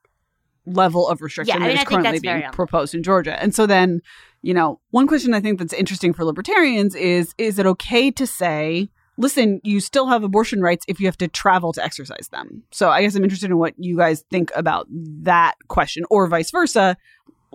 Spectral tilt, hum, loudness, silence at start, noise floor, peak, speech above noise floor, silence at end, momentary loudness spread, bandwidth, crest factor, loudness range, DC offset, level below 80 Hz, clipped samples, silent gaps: -5 dB/octave; none; -18 LUFS; 0.65 s; -71 dBFS; -2 dBFS; 52 dB; 0.6 s; 9 LU; 16.5 kHz; 16 dB; 1 LU; under 0.1%; -48 dBFS; under 0.1%; none